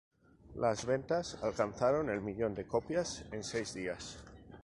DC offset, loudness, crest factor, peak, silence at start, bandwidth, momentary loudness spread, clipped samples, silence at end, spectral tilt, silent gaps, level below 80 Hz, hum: under 0.1%; -36 LUFS; 20 dB; -16 dBFS; 0.45 s; 11.5 kHz; 12 LU; under 0.1%; 0 s; -5 dB/octave; none; -60 dBFS; none